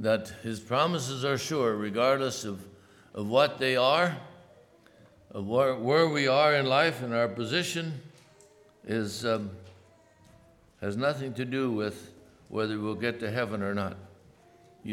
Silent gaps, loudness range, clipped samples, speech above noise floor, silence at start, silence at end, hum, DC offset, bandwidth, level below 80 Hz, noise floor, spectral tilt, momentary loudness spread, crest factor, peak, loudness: none; 8 LU; under 0.1%; 31 dB; 0 s; 0 s; none; under 0.1%; 17.5 kHz; -70 dBFS; -59 dBFS; -5 dB/octave; 16 LU; 20 dB; -10 dBFS; -28 LUFS